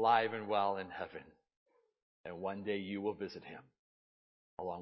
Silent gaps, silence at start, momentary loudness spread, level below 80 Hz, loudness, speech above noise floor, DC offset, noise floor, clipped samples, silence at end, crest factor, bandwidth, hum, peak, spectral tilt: 1.57-1.66 s, 2.02-2.24 s, 3.79-4.57 s; 0 s; 19 LU; -74 dBFS; -38 LUFS; over 53 dB; under 0.1%; under -90 dBFS; under 0.1%; 0 s; 22 dB; 5.8 kHz; none; -18 dBFS; -3 dB/octave